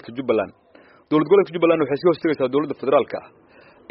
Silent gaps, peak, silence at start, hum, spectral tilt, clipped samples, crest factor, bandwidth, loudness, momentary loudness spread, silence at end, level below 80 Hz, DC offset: none; -4 dBFS; 0.05 s; none; -5.5 dB/octave; under 0.1%; 16 dB; 5.8 kHz; -20 LUFS; 8 LU; 0.7 s; -64 dBFS; under 0.1%